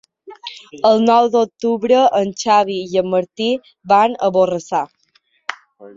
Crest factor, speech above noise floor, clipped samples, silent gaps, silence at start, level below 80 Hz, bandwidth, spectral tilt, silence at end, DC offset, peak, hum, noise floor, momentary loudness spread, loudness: 16 dB; 45 dB; under 0.1%; none; 0.25 s; -60 dBFS; 7.8 kHz; -5 dB/octave; 0.05 s; under 0.1%; -2 dBFS; none; -60 dBFS; 17 LU; -16 LUFS